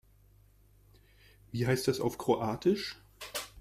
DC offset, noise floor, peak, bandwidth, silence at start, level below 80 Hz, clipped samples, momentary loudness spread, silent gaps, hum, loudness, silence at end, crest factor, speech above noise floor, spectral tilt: under 0.1%; -62 dBFS; -14 dBFS; 15.5 kHz; 1.55 s; -62 dBFS; under 0.1%; 11 LU; none; none; -32 LUFS; 0 s; 20 dB; 31 dB; -5.5 dB/octave